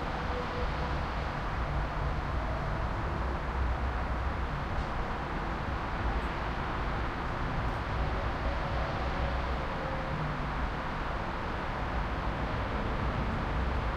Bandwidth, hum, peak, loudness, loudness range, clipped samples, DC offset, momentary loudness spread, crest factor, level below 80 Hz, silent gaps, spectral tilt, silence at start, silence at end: 8.6 kHz; none; -20 dBFS; -34 LUFS; 1 LU; under 0.1%; under 0.1%; 2 LU; 14 dB; -36 dBFS; none; -7 dB/octave; 0 s; 0 s